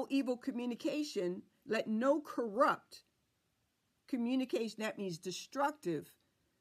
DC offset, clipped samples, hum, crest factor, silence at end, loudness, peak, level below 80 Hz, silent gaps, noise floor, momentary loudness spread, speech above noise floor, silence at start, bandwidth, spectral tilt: under 0.1%; under 0.1%; none; 20 dB; 0.55 s; -37 LUFS; -18 dBFS; -86 dBFS; none; -80 dBFS; 10 LU; 44 dB; 0 s; 15 kHz; -5 dB/octave